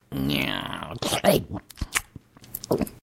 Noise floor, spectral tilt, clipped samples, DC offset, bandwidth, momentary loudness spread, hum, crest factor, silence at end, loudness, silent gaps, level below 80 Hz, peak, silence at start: -48 dBFS; -4 dB/octave; under 0.1%; under 0.1%; 17 kHz; 14 LU; none; 26 dB; 0.05 s; -26 LUFS; none; -44 dBFS; -2 dBFS; 0.1 s